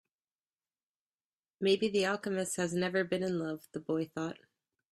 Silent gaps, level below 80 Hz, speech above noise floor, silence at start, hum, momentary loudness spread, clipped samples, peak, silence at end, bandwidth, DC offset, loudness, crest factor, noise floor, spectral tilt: none; -74 dBFS; over 57 dB; 1.6 s; none; 10 LU; under 0.1%; -16 dBFS; 0.6 s; 14 kHz; under 0.1%; -33 LUFS; 20 dB; under -90 dBFS; -4.5 dB/octave